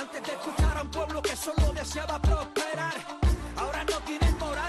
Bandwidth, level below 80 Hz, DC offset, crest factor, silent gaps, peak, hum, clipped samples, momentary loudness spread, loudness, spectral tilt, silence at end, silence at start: 12.5 kHz; -30 dBFS; under 0.1%; 14 dB; none; -14 dBFS; none; under 0.1%; 5 LU; -30 LUFS; -5 dB/octave; 0 s; 0 s